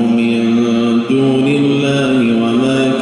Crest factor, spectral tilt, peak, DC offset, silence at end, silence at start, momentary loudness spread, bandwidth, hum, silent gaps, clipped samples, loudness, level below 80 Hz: 10 dB; -6.5 dB/octave; -2 dBFS; under 0.1%; 0 s; 0 s; 1 LU; 11 kHz; none; none; under 0.1%; -13 LUFS; -50 dBFS